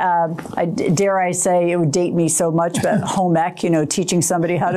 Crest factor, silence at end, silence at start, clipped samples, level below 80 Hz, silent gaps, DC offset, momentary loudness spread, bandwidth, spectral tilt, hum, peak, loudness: 10 dB; 0 s; 0 s; under 0.1%; -56 dBFS; none; under 0.1%; 3 LU; 15.5 kHz; -5 dB/octave; none; -8 dBFS; -18 LUFS